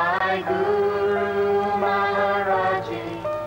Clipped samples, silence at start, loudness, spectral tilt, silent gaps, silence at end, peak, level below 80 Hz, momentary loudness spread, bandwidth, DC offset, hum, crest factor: under 0.1%; 0 s; -22 LUFS; -6 dB/octave; none; 0 s; -10 dBFS; -56 dBFS; 5 LU; 16 kHz; under 0.1%; 50 Hz at -45 dBFS; 12 dB